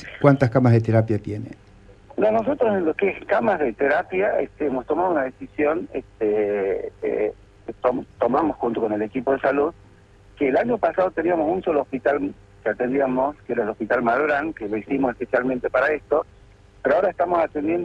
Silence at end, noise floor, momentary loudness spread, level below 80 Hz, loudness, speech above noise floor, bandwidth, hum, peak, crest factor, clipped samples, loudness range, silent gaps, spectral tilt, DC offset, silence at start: 0 s; -50 dBFS; 7 LU; -52 dBFS; -22 LUFS; 29 dB; 8.4 kHz; none; -2 dBFS; 20 dB; under 0.1%; 2 LU; none; -9 dB/octave; under 0.1%; 0 s